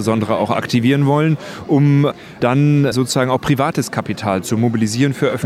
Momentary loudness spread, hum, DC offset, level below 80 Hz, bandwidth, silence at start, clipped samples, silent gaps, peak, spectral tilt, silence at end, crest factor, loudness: 6 LU; none; under 0.1%; -52 dBFS; 15 kHz; 0 s; under 0.1%; none; -2 dBFS; -6.5 dB/octave; 0 s; 14 dB; -16 LUFS